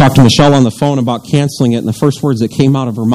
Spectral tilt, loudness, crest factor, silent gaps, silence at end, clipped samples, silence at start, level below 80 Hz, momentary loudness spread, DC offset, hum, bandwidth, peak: -6.5 dB/octave; -11 LUFS; 10 dB; none; 0 s; 1%; 0 s; -38 dBFS; 7 LU; under 0.1%; none; 15 kHz; 0 dBFS